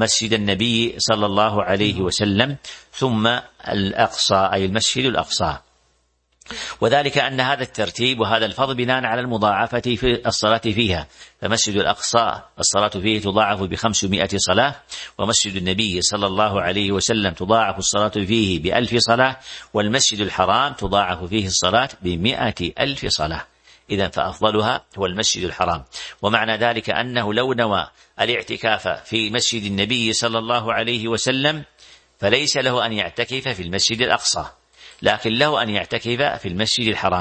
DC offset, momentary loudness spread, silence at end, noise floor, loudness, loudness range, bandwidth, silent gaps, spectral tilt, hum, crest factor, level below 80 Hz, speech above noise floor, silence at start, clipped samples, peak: under 0.1%; 6 LU; 0 s; -65 dBFS; -19 LUFS; 2 LU; 8.8 kHz; none; -3 dB/octave; none; 20 dB; -46 dBFS; 45 dB; 0 s; under 0.1%; 0 dBFS